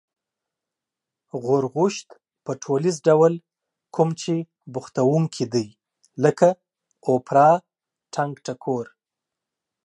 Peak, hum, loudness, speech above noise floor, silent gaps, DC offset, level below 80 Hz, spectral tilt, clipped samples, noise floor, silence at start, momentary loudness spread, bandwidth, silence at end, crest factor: -4 dBFS; none; -22 LUFS; 66 dB; none; under 0.1%; -72 dBFS; -6.5 dB/octave; under 0.1%; -87 dBFS; 1.35 s; 17 LU; 11.5 kHz; 1 s; 20 dB